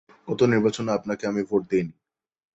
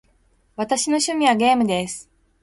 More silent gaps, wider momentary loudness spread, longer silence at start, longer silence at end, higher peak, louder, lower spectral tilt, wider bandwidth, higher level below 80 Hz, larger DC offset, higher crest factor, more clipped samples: neither; second, 8 LU vs 15 LU; second, 0.25 s vs 0.6 s; first, 0.65 s vs 0.4 s; about the same, -6 dBFS vs -4 dBFS; second, -24 LUFS vs -20 LUFS; first, -6.5 dB/octave vs -3 dB/octave; second, 8.2 kHz vs 11.5 kHz; about the same, -60 dBFS vs -58 dBFS; neither; about the same, 18 dB vs 18 dB; neither